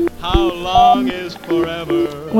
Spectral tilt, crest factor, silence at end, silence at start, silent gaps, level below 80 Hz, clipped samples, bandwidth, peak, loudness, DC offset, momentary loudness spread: -6 dB/octave; 16 dB; 0 s; 0 s; none; -30 dBFS; under 0.1%; 16 kHz; 0 dBFS; -16 LUFS; under 0.1%; 9 LU